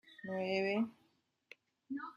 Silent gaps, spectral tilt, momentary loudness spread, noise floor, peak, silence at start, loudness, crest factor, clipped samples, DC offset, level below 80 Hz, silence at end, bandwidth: none; -6.5 dB/octave; 11 LU; -77 dBFS; -22 dBFS; 0.05 s; -38 LUFS; 20 dB; under 0.1%; under 0.1%; -84 dBFS; 0.05 s; 7.6 kHz